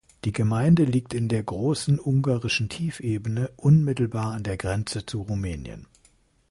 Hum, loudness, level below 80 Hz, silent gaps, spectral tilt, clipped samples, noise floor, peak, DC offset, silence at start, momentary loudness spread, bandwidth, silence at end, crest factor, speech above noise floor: none; -25 LUFS; -46 dBFS; none; -6.5 dB/octave; under 0.1%; -61 dBFS; -8 dBFS; under 0.1%; 0.25 s; 11 LU; 11.5 kHz; 0.65 s; 16 dB; 38 dB